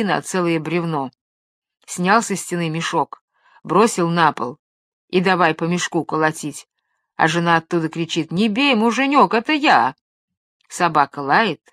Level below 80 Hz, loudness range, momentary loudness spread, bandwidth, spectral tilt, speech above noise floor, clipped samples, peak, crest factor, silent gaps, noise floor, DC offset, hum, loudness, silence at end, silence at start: -68 dBFS; 4 LU; 12 LU; 14.5 kHz; -4.5 dB/octave; 48 dB; under 0.1%; 0 dBFS; 18 dB; 1.21-1.62 s, 3.21-3.28 s, 4.59-5.08 s, 10.01-10.28 s, 10.37-10.60 s; -66 dBFS; under 0.1%; none; -18 LUFS; 0.15 s; 0 s